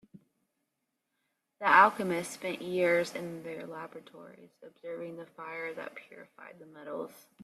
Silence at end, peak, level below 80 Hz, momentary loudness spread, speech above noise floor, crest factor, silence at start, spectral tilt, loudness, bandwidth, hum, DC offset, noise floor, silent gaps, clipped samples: 0.25 s; -8 dBFS; -80 dBFS; 27 LU; 51 dB; 24 dB; 0.15 s; -4.5 dB/octave; -30 LUFS; 14 kHz; none; under 0.1%; -83 dBFS; none; under 0.1%